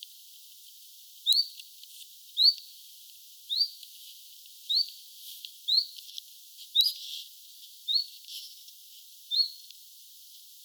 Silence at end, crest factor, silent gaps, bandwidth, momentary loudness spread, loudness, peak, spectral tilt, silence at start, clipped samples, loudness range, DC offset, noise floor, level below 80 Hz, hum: 0.25 s; 26 dB; none; over 20 kHz; 24 LU; -27 LUFS; -8 dBFS; 11 dB/octave; 0 s; under 0.1%; 5 LU; under 0.1%; -52 dBFS; under -90 dBFS; none